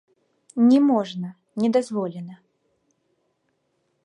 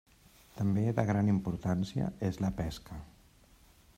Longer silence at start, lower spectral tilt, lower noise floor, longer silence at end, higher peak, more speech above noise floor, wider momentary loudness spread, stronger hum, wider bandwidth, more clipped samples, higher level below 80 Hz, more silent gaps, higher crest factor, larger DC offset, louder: about the same, 0.55 s vs 0.55 s; about the same, -7 dB/octave vs -8 dB/octave; first, -72 dBFS vs -61 dBFS; first, 1.7 s vs 0.9 s; first, -8 dBFS vs -14 dBFS; first, 51 dB vs 30 dB; about the same, 17 LU vs 17 LU; neither; second, 10.5 kHz vs 15 kHz; neither; second, -76 dBFS vs -54 dBFS; neither; about the same, 16 dB vs 20 dB; neither; first, -21 LUFS vs -33 LUFS